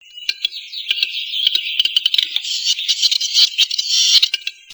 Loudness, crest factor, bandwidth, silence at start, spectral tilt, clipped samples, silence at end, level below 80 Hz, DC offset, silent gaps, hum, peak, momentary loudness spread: -15 LUFS; 18 dB; over 20 kHz; 0.15 s; 6.5 dB/octave; under 0.1%; 0 s; -72 dBFS; under 0.1%; none; none; 0 dBFS; 11 LU